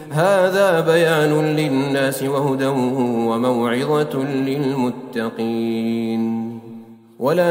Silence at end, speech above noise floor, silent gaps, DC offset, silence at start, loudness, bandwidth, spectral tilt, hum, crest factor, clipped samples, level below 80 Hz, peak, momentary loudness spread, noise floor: 0 s; 21 dB; none; under 0.1%; 0 s; -19 LUFS; 16 kHz; -6 dB/octave; none; 14 dB; under 0.1%; -66 dBFS; -4 dBFS; 8 LU; -39 dBFS